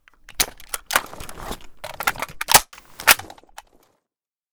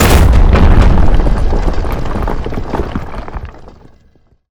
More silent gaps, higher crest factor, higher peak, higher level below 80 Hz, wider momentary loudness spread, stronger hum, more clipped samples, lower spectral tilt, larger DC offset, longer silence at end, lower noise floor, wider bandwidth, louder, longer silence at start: neither; first, 24 dB vs 10 dB; about the same, 0 dBFS vs 0 dBFS; second, -46 dBFS vs -12 dBFS; first, 21 LU vs 17 LU; neither; neither; second, 0 dB/octave vs -6 dB/octave; neither; first, 1.25 s vs 0.85 s; first, -87 dBFS vs -49 dBFS; about the same, over 20 kHz vs over 20 kHz; second, -19 LUFS vs -13 LUFS; first, 0.3 s vs 0 s